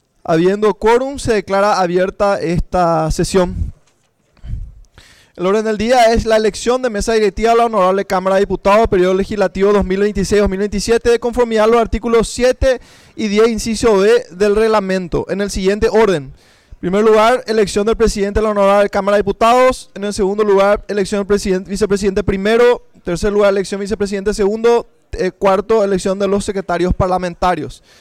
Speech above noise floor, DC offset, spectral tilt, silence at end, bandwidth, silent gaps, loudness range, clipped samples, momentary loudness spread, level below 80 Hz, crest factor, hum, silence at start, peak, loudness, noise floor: 44 dB; under 0.1%; -5.5 dB/octave; 0.25 s; 15 kHz; none; 3 LU; under 0.1%; 7 LU; -30 dBFS; 10 dB; none; 0.3 s; -6 dBFS; -14 LUFS; -58 dBFS